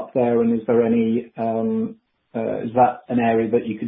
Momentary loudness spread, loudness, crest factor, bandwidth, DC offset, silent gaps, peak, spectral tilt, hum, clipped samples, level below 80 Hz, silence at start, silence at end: 8 LU; -21 LUFS; 16 dB; 3.8 kHz; under 0.1%; none; -4 dBFS; -12.5 dB/octave; none; under 0.1%; -58 dBFS; 0 s; 0 s